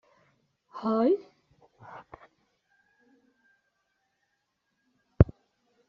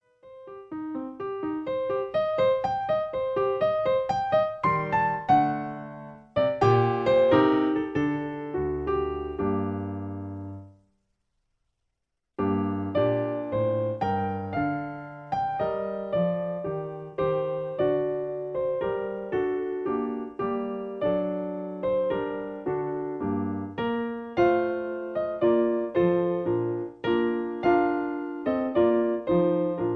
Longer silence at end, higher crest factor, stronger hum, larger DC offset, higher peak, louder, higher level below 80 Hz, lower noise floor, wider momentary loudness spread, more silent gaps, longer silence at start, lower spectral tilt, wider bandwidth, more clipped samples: first, 0.65 s vs 0 s; first, 30 dB vs 18 dB; neither; neither; first, -2 dBFS vs -8 dBFS; about the same, -27 LUFS vs -27 LUFS; first, -44 dBFS vs -54 dBFS; about the same, -79 dBFS vs -81 dBFS; first, 23 LU vs 10 LU; neither; first, 0.75 s vs 0.25 s; about the same, -9.5 dB/octave vs -8.5 dB/octave; about the same, 5.8 kHz vs 6.2 kHz; neither